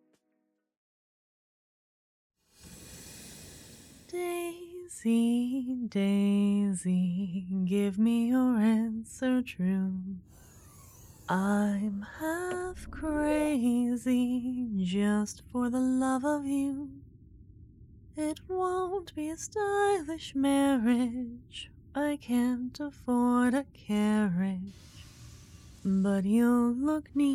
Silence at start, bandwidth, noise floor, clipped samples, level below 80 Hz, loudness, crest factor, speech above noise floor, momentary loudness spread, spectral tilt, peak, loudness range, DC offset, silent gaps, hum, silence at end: 2.65 s; 15 kHz; -78 dBFS; under 0.1%; -58 dBFS; -30 LUFS; 14 dB; 50 dB; 17 LU; -6.5 dB/octave; -16 dBFS; 5 LU; under 0.1%; none; none; 0 s